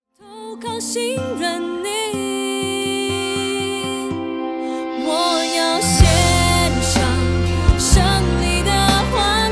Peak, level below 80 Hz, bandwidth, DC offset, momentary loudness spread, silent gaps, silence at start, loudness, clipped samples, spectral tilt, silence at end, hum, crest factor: 0 dBFS; -26 dBFS; 11 kHz; under 0.1%; 10 LU; none; 0.25 s; -18 LUFS; under 0.1%; -4 dB/octave; 0 s; none; 18 dB